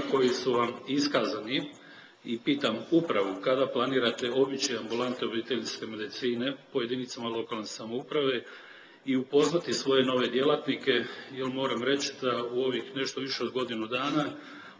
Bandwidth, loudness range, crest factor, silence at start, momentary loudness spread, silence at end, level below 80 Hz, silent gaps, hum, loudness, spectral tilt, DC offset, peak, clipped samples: 8 kHz; 5 LU; 18 dB; 0 s; 10 LU; 0.05 s; -74 dBFS; none; none; -29 LUFS; -4 dB/octave; under 0.1%; -12 dBFS; under 0.1%